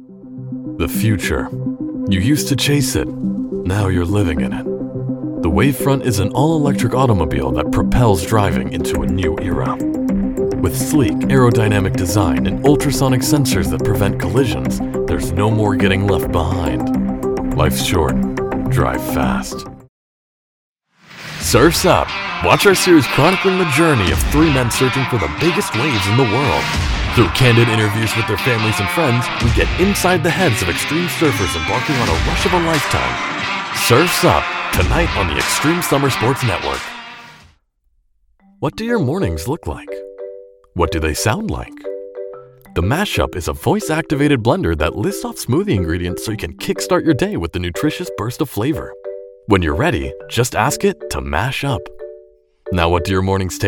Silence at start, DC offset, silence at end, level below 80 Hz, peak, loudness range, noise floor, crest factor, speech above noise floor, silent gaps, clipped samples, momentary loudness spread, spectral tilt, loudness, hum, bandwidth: 0 s; under 0.1%; 0 s; -30 dBFS; 0 dBFS; 6 LU; -61 dBFS; 16 dB; 46 dB; 19.89-20.75 s; under 0.1%; 11 LU; -5 dB/octave; -16 LUFS; none; 18 kHz